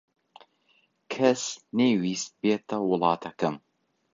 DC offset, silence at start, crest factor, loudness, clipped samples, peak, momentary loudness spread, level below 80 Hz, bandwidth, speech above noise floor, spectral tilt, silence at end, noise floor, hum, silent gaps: under 0.1%; 1.1 s; 20 dB; -27 LUFS; under 0.1%; -8 dBFS; 7 LU; -72 dBFS; 7.6 kHz; 42 dB; -4.5 dB/octave; 0.55 s; -67 dBFS; none; none